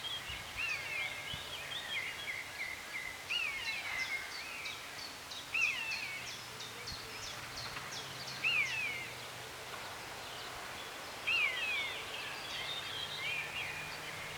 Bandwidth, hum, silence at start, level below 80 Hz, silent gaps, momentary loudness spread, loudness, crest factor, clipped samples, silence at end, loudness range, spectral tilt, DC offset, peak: over 20 kHz; none; 0 s; -66 dBFS; none; 11 LU; -38 LUFS; 18 dB; under 0.1%; 0 s; 2 LU; -1 dB/octave; under 0.1%; -22 dBFS